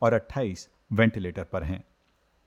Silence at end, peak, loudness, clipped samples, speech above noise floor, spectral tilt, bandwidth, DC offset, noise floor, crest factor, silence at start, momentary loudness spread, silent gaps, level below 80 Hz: 0.65 s; -8 dBFS; -28 LUFS; under 0.1%; 41 dB; -7 dB/octave; 10.5 kHz; under 0.1%; -68 dBFS; 20 dB; 0 s; 12 LU; none; -48 dBFS